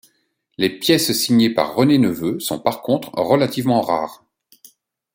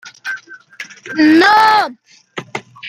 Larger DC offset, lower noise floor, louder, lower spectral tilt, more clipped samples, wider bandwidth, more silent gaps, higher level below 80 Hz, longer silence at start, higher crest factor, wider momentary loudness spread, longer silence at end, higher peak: neither; first, -66 dBFS vs -35 dBFS; second, -18 LUFS vs -11 LUFS; first, -5 dB/octave vs -3.5 dB/octave; neither; first, 17 kHz vs 15 kHz; neither; about the same, -58 dBFS vs -60 dBFS; first, 0.6 s vs 0.05 s; about the same, 18 dB vs 14 dB; second, 7 LU vs 23 LU; first, 1 s vs 0 s; about the same, 0 dBFS vs 0 dBFS